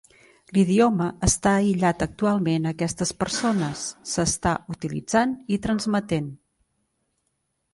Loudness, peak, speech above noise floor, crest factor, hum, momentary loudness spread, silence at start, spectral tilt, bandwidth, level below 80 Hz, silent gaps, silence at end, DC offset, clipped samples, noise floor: -23 LUFS; -6 dBFS; 52 dB; 18 dB; none; 8 LU; 0.5 s; -5 dB/octave; 11.5 kHz; -44 dBFS; none; 1.4 s; under 0.1%; under 0.1%; -75 dBFS